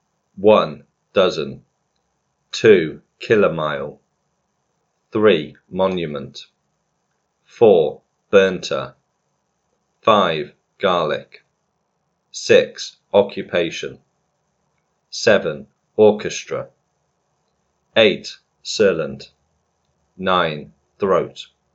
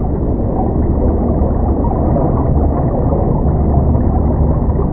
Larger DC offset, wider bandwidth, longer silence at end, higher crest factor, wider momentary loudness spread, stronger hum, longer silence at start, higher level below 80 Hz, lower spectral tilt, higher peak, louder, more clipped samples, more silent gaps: neither; first, 8 kHz vs 2.2 kHz; first, 0.3 s vs 0 s; first, 20 dB vs 12 dB; first, 18 LU vs 2 LU; neither; first, 0.4 s vs 0 s; second, -60 dBFS vs -16 dBFS; second, -4.5 dB/octave vs -15 dB/octave; about the same, 0 dBFS vs 0 dBFS; second, -18 LUFS vs -15 LUFS; neither; neither